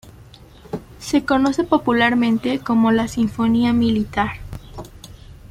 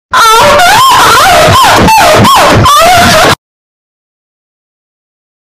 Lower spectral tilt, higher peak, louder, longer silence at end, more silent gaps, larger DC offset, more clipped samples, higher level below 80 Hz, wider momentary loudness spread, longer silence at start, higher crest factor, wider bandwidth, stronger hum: first, -5.5 dB/octave vs -3 dB/octave; second, -4 dBFS vs 0 dBFS; second, -18 LUFS vs -2 LUFS; second, 0.05 s vs 2.1 s; neither; neither; second, under 0.1% vs 0.2%; second, -44 dBFS vs -26 dBFS; first, 19 LU vs 1 LU; about the same, 0.05 s vs 0.1 s; first, 16 dB vs 4 dB; second, 14 kHz vs 16.5 kHz; neither